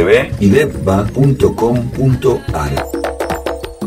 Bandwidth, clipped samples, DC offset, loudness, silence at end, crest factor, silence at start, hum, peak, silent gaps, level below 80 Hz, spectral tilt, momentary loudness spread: 16 kHz; under 0.1%; 0.3%; -14 LUFS; 0 s; 14 dB; 0 s; none; 0 dBFS; none; -30 dBFS; -7 dB/octave; 8 LU